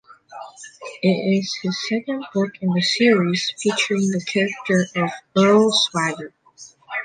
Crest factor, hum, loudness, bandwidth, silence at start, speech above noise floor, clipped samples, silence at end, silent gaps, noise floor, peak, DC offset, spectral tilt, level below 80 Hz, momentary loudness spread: 16 dB; none; -20 LUFS; 9.4 kHz; 0.3 s; 27 dB; under 0.1%; 0 s; none; -47 dBFS; -4 dBFS; under 0.1%; -4.5 dB/octave; -66 dBFS; 20 LU